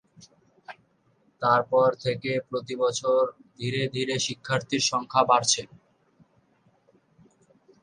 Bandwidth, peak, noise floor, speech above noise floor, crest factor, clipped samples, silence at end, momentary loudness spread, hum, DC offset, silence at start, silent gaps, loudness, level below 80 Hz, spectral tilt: 10.5 kHz; -6 dBFS; -66 dBFS; 41 dB; 22 dB; under 0.1%; 2.2 s; 12 LU; none; under 0.1%; 0.2 s; none; -25 LUFS; -68 dBFS; -3.5 dB/octave